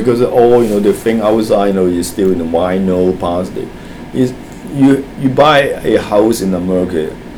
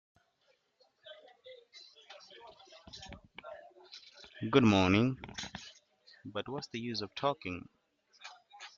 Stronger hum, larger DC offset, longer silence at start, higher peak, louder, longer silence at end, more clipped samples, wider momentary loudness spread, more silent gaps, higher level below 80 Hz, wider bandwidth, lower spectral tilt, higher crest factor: neither; neither; second, 0 s vs 1.05 s; first, 0 dBFS vs -12 dBFS; first, -12 LUFS vs -33 LUFS; about the same, 0 s vs 0.1 s; neither; second, 11 LU vs 27 LU; neither; first, -38 dBFS vs -66 dBFS; first, 20 kHz vs 7.6 kHz; first, -6 dB/octave vs -4.5 dB/octave; second, 12 dB vs 24 dB